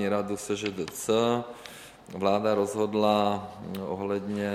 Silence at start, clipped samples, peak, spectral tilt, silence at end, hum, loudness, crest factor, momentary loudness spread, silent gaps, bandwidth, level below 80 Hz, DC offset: 0 s; under 0.1%; -10 dBFS; -5 dB/octave; 0 s; none; -28 LUFS; 18 dB; 16 LU; none; 16 kHz; -64 dBFS; under 0.1%